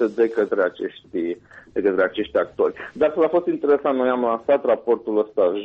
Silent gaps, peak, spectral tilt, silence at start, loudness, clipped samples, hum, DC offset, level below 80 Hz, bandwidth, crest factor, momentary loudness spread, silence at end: none; -8 dBFS; -7.5 dB/octave; 0 s; -21 LUFS; under 0.1%; none; under 0.1%; -60 dBFS; 5.6 kHz; 14 dB; 8 LU; 0 s